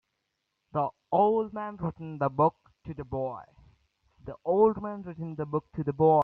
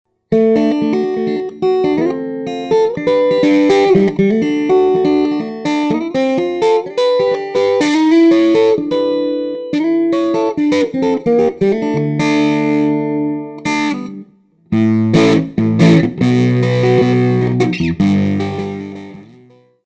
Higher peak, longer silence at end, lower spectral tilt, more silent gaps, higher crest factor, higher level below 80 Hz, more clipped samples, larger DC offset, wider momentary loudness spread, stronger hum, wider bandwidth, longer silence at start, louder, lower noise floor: second, -10 dBFS vs 0 dBFS; second, 0 s vs 0.6 s; first, -11 dB/octave vs -7 dB/octave; neither; about the same, 18 dB vs 14 dB; second, -60 dBFS vs -48 dBFS; neither; neither; first, 18 LU vs 9 LU; neither; second, 4.4 kHz vs 9 kHz; first, 0.75 s vs 0.3 s; second, -29 LUFS vs -14 LUFS; first, -81 dBFS vs -46 dBFS